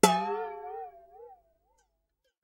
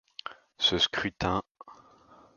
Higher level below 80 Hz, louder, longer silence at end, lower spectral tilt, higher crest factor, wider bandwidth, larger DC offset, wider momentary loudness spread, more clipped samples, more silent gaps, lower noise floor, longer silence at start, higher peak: second, -68 dBFS vs -52 dBFS; second, -32 LUFS vs -27 LUFS; first, 1.1 s vs 0.65 s; about the same, -3.5 dB/octave vs -3.5 dB/octave; first, 28 dB vs 22 dB; first, 16 kHz vs 7.4 kHz; neither; first, 25 LU vs 19 LU; neither; second, none vs 1.51-1.55 s; first, -79 dBFS vs -57 dBFS; second, 0.05 s vs 0.25 s; first, -4 dBFS vs -10 dBFS